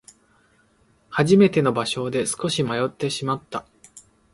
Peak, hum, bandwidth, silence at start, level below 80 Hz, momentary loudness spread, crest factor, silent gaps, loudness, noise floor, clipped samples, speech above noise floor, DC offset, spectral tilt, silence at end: -4 dBFS; none; 11.5 kHz; 1.1 s; -58 dBFS; 13 LU; 20 dB; none; -21 LUFS; -61 dBFS; under 0.1%; 40 dB; under 0.1%; -5 dB/octave; 0.35 s